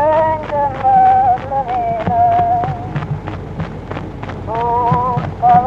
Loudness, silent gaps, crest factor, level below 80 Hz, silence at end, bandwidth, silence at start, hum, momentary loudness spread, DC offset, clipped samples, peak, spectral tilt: -15 LUFS; none; 14 dB; -36 dBFS; 0 s; 6.8 kHz; 0 s; none; 15 LU; under 0.1%; under 0.1%; 0 dBFS; -8.5 dB/octave